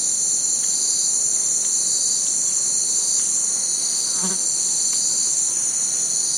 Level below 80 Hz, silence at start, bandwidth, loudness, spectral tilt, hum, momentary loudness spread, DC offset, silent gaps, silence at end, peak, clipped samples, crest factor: -74 dBFS; 0 s; 16 kHz; -17 LUFS; 1 dB/octave; none; 2 LU; under 0.1%; none; 0 s; -6 dBFS; under 0.1%; 14 dB